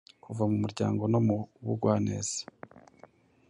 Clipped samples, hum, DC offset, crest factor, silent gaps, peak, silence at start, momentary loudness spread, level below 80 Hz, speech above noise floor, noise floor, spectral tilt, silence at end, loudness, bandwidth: under 0.1%; none; under 0.1%; 18 dB; none; -12 dBFS; 0.3 s; 10 LU; -60 dBFS; 29 dB; -58 dBFS; -6.5 dB/octave; 0.7 s; -30 LUFS; 11 kHz